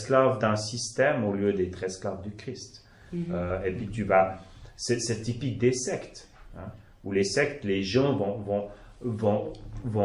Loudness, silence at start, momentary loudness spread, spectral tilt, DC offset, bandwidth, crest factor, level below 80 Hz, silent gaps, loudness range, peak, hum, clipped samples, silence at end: -28 LUFS; 0 s; 18 LU; -5 dB/octave; under 0.1%; 11.5 kHz; 20 dB; -50 dBFS; none; 2 LU; -8 dBFS; none; under 0.1%; 0 s